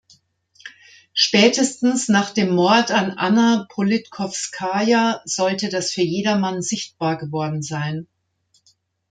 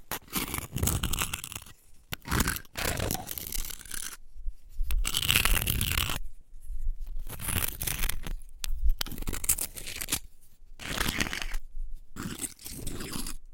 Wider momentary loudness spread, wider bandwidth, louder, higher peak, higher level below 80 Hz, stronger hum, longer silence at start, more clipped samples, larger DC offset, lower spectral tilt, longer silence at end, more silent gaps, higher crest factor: second, 10 LU vs 15 LU; second, 9.4 kHz vs 17 kHz; first, -19 LUFS vs -31 LUFS; about the same, -2 dBFS vs -4 dBFS; second, -64 dBFS vs -36 dBFS; neither; first, 0.65 s vs 0 s; neither; neither; first, -4 dB/octave vs -2.5 dB/octave; first, 1.05 s vs 0 s; neither; second, 18 dB vs 26 dB